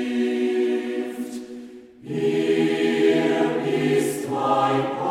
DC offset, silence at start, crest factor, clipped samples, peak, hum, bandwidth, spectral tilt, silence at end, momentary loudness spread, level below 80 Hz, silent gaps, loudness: under 0.1%; 0 s; 14 dB; under 0.1%; -8 dBFS; none; 15.5 kHz; -5.5 dB/octave; 0 s; 14 LU; -68 dBFS; none; -22 LUFS